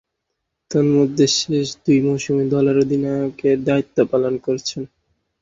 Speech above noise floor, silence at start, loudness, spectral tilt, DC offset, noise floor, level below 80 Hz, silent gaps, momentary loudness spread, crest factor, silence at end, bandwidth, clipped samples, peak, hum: 59 dB; 0.7 s; -18 LUFS; -5.5 dB/octave; under 0.1%; -77 dBFS; -56 dBFS; none; 7 LU; 16 dB; 0.55 s; 7.8 kHz; under 0.1%; -4 dBFS; none